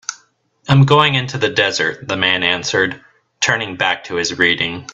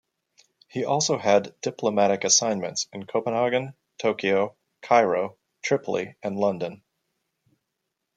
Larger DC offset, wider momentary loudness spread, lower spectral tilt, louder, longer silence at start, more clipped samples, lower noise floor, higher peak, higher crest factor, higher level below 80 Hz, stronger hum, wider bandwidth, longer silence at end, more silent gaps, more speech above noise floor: neither; second, 9 LU vs 13 LU; about the same, -4 dB/octave vs -3 dB/octave; first, -15 LUFS vs -24 LUFS; second, 0.1 s vs 0.75 s; neither; second, -55 dBFS vs -81 dBFS; first, 0 dBFS vs -4 dBFS; second, 16 dB vs 22 dB; first, -52 dBFS vs -74 dBFS; neither; second, 8 kHz vs 10 kHz; second, 0 s vs 1.4 s; neither; second, 39 dB vs 57 dB